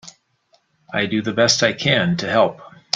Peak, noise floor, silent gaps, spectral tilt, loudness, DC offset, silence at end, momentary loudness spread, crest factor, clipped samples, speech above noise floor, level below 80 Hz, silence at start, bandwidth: 0 dBFS; -62 dBFS; none; -3.5 dB/octave; -18 LUFS; under 0.1%; 0.3 s; 6 LU; 20 dB; under 0.1%; 43 dB; -58 dBFS; 0.05 s; 9.4 kHz